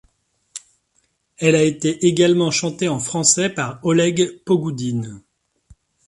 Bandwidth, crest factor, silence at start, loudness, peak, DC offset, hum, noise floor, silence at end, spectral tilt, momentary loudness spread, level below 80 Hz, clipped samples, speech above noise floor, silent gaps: 11.5 kHz; 18 dB; 0.55 s; -18 LUFS; -2 dBFS; under 0.1%; none; -66 dBFS; 0.9 s; -4 dB/octave; 17 LU; -58 dBFS; under 0.1%; 48 dB; none